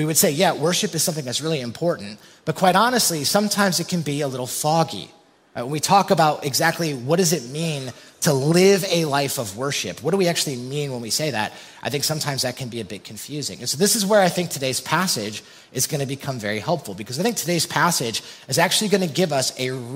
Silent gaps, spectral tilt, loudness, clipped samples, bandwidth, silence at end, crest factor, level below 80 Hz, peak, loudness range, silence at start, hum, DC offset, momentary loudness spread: none; -3.5 dB/octave; -21 LUFS; under 0.1%; 16.5 kHz; 0 s; 20 dB; -64 dBFS; -2 dBFS; 3 LU; 0 s; none; under 0.1%; 13 LU